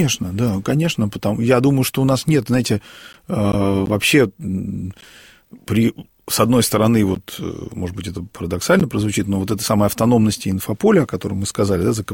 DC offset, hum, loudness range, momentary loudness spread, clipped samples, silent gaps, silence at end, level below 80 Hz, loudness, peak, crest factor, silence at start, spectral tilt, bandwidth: under 0.1%; none; 2 LU; 12 LU; under 0.1%; none; 0 s; -44 dBFS; -18 LUFS; -2 dBFS; 16 dB; 0 s; -5.5 dB/octave; 17 kHz